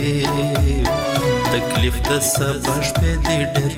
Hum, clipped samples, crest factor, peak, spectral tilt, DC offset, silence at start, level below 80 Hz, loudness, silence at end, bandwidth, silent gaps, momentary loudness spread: none; under 0.1%; 12 dB; -6 dBFS; -4.5 dB/octave; under 0.1%; 0 s; -26 dBFS; -19 LUFS; 0 s; 17 kHz; none; 2 LU